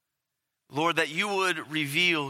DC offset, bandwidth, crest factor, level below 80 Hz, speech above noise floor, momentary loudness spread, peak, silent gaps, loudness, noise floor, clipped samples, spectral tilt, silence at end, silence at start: under 0.1%; 16.5 kHz; 20 dB; -82 dBFS; 57 dB; 6 LU; -8 dBFS; none; -26 LUFS; -84 dBFS; under 0.1%; -3.5 dB/octave; 0 s; 0.7 s